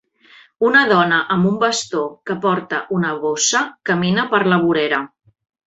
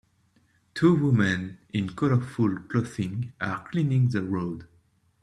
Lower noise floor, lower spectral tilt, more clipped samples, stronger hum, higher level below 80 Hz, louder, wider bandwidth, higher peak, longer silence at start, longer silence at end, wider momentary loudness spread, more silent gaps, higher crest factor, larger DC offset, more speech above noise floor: second, -49 dBFS vs -65 dBFS; second, -4 dB/octave vs -7.5 dB/octave; neither; neither; about the same, -60 dBFS vs -60 dBFS; first, -17 LUFS vs -26 LUFS; second, 8.2 kHz vs 11 kHz; first, -2 dBFS vs -8 dBFS; second, 0.6 s vs 0.75 s; about the same, 0.6 s vs 0.6 s; about the same, 8 LU vs 10 LU; neither; about the same, 16 dB vs 18 dB; neither; second, 32 dB vs 40 dB